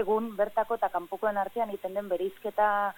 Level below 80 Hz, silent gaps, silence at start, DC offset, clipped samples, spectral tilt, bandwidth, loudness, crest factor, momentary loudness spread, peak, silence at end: -64 dBFS; none; 0 s; under 0.1%; under 0.1%; -6 dB/octave; 17.5 kHz; -30 LUFS; 16 dB; 5 LU; -14 dBFS; 0.05 s